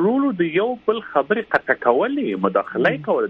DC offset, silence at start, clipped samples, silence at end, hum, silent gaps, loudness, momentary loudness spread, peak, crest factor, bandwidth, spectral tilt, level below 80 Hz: under 0.1%; 0 s; under 0.1%; 0 s; none; none; -20 LUFS; 3 LU; -2 dBFS; 18 dB; 5.6 kHz; -8.5 dB/octave; -62 dBFS